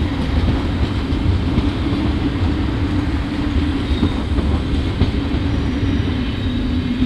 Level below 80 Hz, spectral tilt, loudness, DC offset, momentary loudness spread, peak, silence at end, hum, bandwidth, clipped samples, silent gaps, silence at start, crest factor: -22 dBFS; -7.5 dB/octave; -19 LUFS; under 0.1%; 2 LU; -4 dBFS; 0 s; none; 10 kHz; under 0.1%; none; 0 s; 14 dB